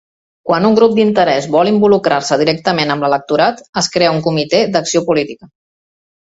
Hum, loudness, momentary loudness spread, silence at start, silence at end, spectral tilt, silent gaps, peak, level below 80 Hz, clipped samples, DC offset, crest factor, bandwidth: none; -13 LUFS; 6 LU; 0.45 s; 1.05 s; -4.5 dB/octave; 3.69-3.73 s; 0 dBFS; -54 dBFS; under 0.1%; under 0.1%; 14 dB; 8 kHz